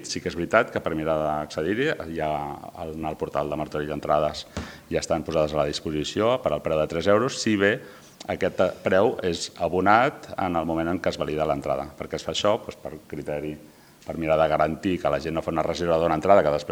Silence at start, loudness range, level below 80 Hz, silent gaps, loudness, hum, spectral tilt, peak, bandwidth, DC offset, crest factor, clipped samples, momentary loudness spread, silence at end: 0 s; 4 LU; -50 dBFS; none; -25 LUFS; none; -5 dB/octave; -2 dBFS; 17 kHz; under 0.1%; 24 dB; under 0.1%; 12 LU; 0 s